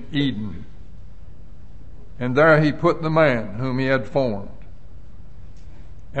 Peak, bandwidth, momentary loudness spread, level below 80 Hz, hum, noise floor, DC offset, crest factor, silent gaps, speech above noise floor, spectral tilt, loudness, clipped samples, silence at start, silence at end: -4 dBFS; 8.4 kHz; 17 LU; -44 dBFS; none; -43 dBFS; 3%; 18 dB; none; 23 dB; -8 dB/octave; -20 LUFS; under 0.1%; 0 s; 0 s